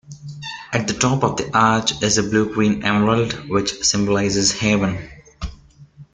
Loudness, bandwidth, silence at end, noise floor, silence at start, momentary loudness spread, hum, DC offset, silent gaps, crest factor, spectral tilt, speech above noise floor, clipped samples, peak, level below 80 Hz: -18 LUFS; 9.6 kHz; 0.1 s; -45 dBFS; 0.1 s; 16 LU; none; under 0.1%; none; 18 dB; -4 dB/octave; 26 dB; under 0.1%; -2 dBFS; -42 dBFS